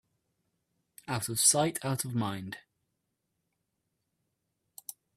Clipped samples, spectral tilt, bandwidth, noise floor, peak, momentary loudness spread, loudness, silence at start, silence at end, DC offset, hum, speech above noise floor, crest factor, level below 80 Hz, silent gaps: under 0.1%; -3 dB/octave; 15.5 kHz; -82 dBFS; -10 dBFS; 22 LU; -28 LUFS; 1.1 s; 2.6 s; under 0.1%; none; 52 dB; 26 dB; -72 dBFS; none